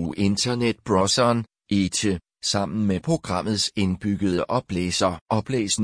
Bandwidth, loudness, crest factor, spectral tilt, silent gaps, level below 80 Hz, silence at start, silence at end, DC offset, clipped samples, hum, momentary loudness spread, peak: 10.5 kHz; -23 LUFS; 16 dB; -4.5 dB/octave; 5.21-5.26 s; -50 dBFS; 0 s; 0 s; under 0.1%; under 0.1%; none; 5 LU; -8 dBFS